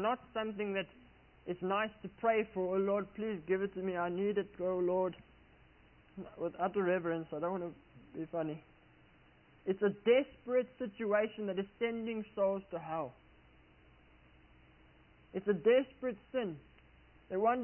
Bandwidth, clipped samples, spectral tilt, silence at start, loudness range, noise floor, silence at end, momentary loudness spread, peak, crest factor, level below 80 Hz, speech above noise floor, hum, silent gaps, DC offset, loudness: 3.1 kHz; under 0.1%; -2.5 dB/octave; 0 s; 5 LU; -64 dBFS; 0 s; 13 LU; -18 dBFS; 20 dB; -68 dBFS; 29 dB; none; none; under 0.1%; -36 LUFS